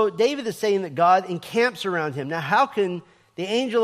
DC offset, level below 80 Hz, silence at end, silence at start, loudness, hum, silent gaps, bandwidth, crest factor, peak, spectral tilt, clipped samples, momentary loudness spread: under 0.1%; -72 dBFS; 0 s; 0 s; -23 LUFS; none; none; 15.5 kHz; 16 dB; -6 dBFS; -5 dB/octave; under 0.1%; 9 LU